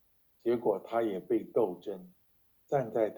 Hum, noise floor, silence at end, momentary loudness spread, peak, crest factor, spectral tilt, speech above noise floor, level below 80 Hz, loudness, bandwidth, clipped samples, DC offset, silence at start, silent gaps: none; -69 dBFS; 0 s; 11 LU; -16 dBFS; 18 dB; -8 dB/octave; 37 dB; -74 dBFS; -33 LUFS; over 20 kHz; under 0.1%; under 0.1%; 0.45 s; none